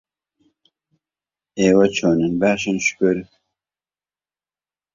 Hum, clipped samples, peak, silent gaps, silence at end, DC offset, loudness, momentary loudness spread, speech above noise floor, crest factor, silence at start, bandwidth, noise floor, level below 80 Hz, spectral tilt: none; under 0.1%; -2 dBFS; none; 1.7 s; under 0.1%; -18 LUFS; 6 LU; over 73 dB; 20 dB; 1.55 s; 7.6 kHz; under -90 dBFS; -56 dBFS; -5 dB/octave